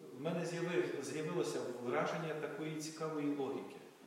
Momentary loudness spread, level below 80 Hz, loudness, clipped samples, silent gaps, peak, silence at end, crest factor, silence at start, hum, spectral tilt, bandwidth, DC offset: 5 LU; under -90 dBFS; -40 LUFS; under 0.1%; none; -24 dBFS; 0 s; 16 dB; 0 s; none; -5.5 dB/octave; 16 kHz; under 0.1%